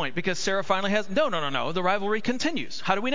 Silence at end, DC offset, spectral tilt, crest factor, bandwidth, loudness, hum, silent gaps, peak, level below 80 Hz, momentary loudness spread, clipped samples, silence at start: 0 s; 3%; -4 dB/octave; 20 dB; 7.8 kHz; -26 LUFS; none; none; -6 dBFS; -64 dBFS; 3 LU; under 0.1%; 0 s